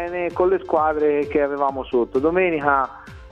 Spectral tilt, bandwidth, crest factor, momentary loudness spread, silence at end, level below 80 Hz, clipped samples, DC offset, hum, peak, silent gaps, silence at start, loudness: -8 dB/octave; 6.4 kHz; 18 dB; 5 LU; 0 s; -46 dBFS; under 0.1%; under 0.1%; none; -2 dBFS; none; 0 s; -20 LUFS